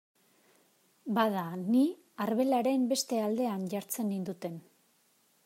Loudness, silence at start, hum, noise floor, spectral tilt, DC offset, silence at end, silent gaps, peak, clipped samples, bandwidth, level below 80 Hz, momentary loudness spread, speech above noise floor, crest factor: -31 LUFS; 1.05 s; none; -69 dBFS; -5 dB/octave; under 0.1%; 0.85 s; none; -14 dBFS; under 0.1%; 16 kHz; -84 dBFS; 11 LU; 39 dB; 18 dB